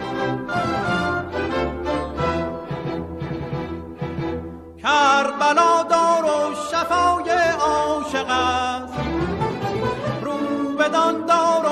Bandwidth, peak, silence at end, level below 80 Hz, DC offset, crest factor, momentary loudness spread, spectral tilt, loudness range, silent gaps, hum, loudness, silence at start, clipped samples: 13.5 kHz; -4 dBFS; 0 s; -44 dBFS; under 0.1%; 16 dB; 12 LU; -5 dB/octave; 8 LU; none; none; -21 LUFS; 0 s; under 0.1%